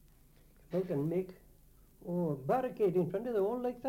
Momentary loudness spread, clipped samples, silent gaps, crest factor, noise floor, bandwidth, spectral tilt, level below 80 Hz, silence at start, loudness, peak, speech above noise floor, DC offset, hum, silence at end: 8 LU; under 0.1%; none; 16 dB; -62 dBFS; 16.5 kHz; -9 dB/octave; -64 dBFS; 0.7 s; -34 LUFS; -20 dBFS; 28 dB; under 0.1%; none; 0 s